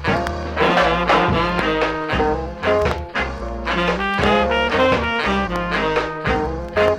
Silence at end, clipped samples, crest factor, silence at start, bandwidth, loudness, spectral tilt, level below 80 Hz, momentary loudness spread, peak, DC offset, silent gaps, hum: 0 s; under 0.1%; 18 dB; 0 s; 15.5 kHz; -19 LUFS; -5.5 dB/octave; -32 dBFS; 7 LU; -2 dBFS; under 0.1%; none; none